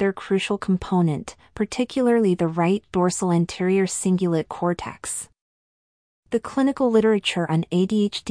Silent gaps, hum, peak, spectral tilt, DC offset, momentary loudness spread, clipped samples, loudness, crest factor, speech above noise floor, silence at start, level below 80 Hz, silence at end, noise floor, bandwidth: 5.41-6.23 s; none; -8 dBFS; -5.5 dB/octave; under 0.1%; 10 LU; under 0.1%; -22 LUFS; 16 dB; over 68 dB; 0 s; -54 dBFS; 0 s; under -90 dBFS; 10.5 kHz